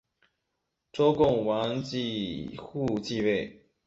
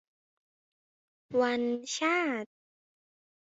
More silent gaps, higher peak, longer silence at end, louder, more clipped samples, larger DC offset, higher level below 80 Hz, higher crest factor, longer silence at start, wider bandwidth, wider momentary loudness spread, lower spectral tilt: neither; first, -10 dBFS vs -16 dBFS; second, 0.35 s vs 1.05 s; about the same, -28 LUFS vs -30 LUFS; neither; neither; first, -56 dBFS vs -80 dBFS; about the same, 18 dB vs 20 dB; second, 0.95 s vs 1.3 s; about the same, 8 kHz vs 8 kHz; first, 14 LU vs 8 LU; first, -6.5 dB/octave vs -2.5 dB/octave